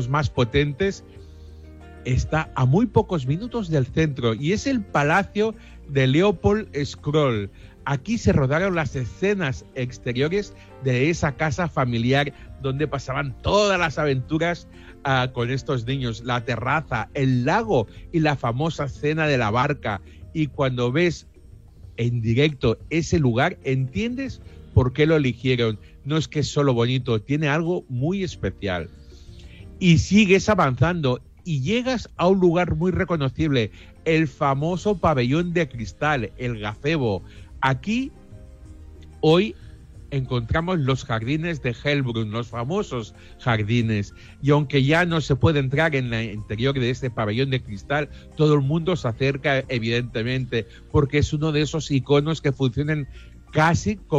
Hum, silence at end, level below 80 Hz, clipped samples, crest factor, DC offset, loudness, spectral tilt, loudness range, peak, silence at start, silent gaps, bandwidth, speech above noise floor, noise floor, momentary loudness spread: none; 0 s; -42 dBFS; under 0.1%; 18 dB; under 0.1%; -23 LUFS; -6.5 dB/octave; 3 LU; -4 dBFS; 0 s; none; 8.2 kHz; 24 dB; -46 dBFS; 9 LU